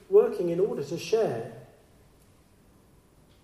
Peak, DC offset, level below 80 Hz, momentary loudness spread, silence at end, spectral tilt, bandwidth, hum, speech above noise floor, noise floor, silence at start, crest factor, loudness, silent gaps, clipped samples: -10 dBFS; under 0.1%; -66 dBFS; 17 LU; 1.8 s; -6 dB/octave; 13 kHz; none; 31 dB; -59 dBFS; 0.1 s; 20 dB; -27 LUFS; none; under 0.1%